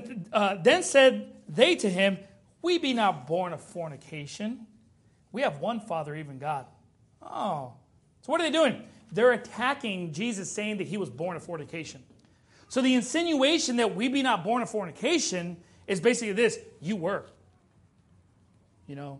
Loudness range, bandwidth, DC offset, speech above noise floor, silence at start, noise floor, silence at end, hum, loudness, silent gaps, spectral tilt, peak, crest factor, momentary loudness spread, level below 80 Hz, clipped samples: 9 LU; 11.5 kHz; under 0.1%; 35 dB; 0 s; -62 dBFS; 0 s; none; -27 LUFS; none; -4 dB/octave; -6 dBFS; 24 dB; 16 LU; -72 dBFS; under 0.1%